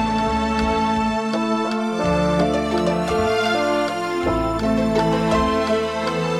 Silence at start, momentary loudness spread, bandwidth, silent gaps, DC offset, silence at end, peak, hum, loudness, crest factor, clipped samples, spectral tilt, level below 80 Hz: 0 s; 3 LU; 13.5 kHz; none; under 0.1%; 0 s; -6 dBFS; none; -20 LUFS; 12 dB; under 0.1%; -6 dB/octave; -36 dBFS